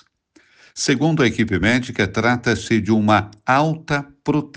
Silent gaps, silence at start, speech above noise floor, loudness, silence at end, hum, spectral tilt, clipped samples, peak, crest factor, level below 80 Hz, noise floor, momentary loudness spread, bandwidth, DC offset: none; 0.75 s; 38 dB; -19 LUFS; 0.1 s; none; -5.5 dB/octave; under 0.1%; -2 dBFS; 16 dB; -48 dBFS; -57 dBFS; 7 LU; 9.8 kHz; under 0.1%